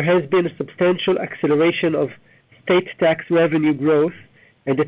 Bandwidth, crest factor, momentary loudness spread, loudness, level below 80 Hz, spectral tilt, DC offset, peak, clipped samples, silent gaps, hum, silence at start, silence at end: 4 kHz; 14 dB; 7 LU; -19 LUFS; -62 dBFS; -10.5 dB/octave; under 0.1%; -4 dBFS; under 0.1%; none; none; 0 s; 0 s